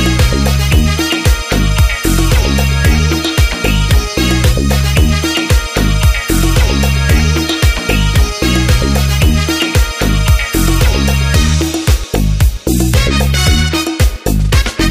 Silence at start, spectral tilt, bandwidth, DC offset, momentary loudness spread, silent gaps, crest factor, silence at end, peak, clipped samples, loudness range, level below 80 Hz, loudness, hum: 0 s; -4.5 dB/octave; 15.5 kHz; 0.5%; 2 LU; none; 10 dB; 0 s; 0 dBFS; under 0.1%; 1 LU; -14 dBFS; -12 LUFS; none